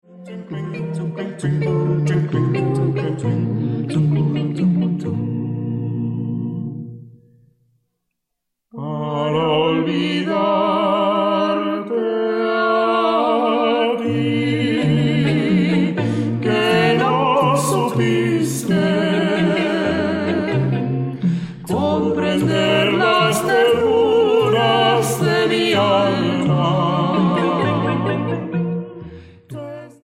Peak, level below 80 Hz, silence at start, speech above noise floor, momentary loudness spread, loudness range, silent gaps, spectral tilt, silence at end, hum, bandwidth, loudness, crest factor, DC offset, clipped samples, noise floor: -4 dBFS; -52 dBFS; 0.1 s; 58 dB; 10 LU; 7 LU; none; -6 dB/octave; 0.1 s; none; 16 kHz; -18 LUFS; 14 dB; under 0.1%; under 0.1%; -77 dBFS